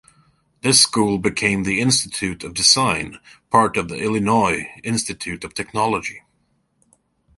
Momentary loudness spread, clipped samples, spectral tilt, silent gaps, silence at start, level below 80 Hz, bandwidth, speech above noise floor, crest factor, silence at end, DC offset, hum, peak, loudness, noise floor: 13 LU; under 0.1%; -3 dB/octave; none; 0.65 s; -48 dBFS; 12 kHz; 46 dB; 20 dB; 1.2 s; under 0.1%; none; 0 dBFS; -18 LUFS; -66 dBFS